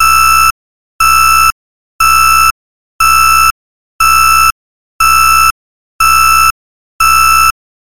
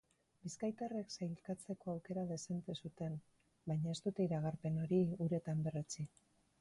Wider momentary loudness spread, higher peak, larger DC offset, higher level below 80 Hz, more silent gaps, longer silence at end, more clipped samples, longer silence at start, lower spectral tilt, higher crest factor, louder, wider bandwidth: second, 6 LU vs 11 LU; first, 0 dBFS vs -26 dBFS; first, 8% vs under 0.1%; first, -30 dBFS vs -72 dBFS; first, 0.51-0.99 s, 1.52-1.99 s, 2.51-2.99 s, 3.51-3.99 s, 4.52-5.00 s, 5.51-5.99 s, 6.51-6.99 s vs none; about the same, 0.45 s vs 0.55 s; neither; second, 0 s vs 0.45 s; second, 0.5 dB/octave vs -7 dB/octave; second, 10 dB vs 16 dB; first, -7 LUFS vs -42 LUFS; first, 17 kHz vs 11.5 kHz